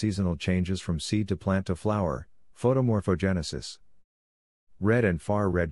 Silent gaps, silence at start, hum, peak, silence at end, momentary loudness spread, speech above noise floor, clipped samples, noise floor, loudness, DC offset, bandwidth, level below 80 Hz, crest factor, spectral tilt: 4.04-4.67 s; 0 s; none; -10 dBFS; 0 s; 7 LU; over 64 dB; under 0.1%; under -90 dBFS; -28 LUFS; 0.2%; 11.5 kHz; -50 dBFS; 18 dB; -6.5 dB/octave